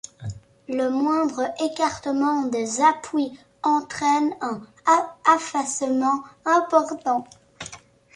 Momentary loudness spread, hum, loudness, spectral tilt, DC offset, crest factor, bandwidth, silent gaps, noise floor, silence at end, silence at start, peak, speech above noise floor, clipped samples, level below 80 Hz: 14 LU; none; -23 LUFS; -4 dB/octave; under 0.1%; 20 dB; 11.5 kHz; none; -44 dBFS; 0.4 s; 0.2 s; -4 dBFS; 22 dB; under 0.1%; -60 dBFS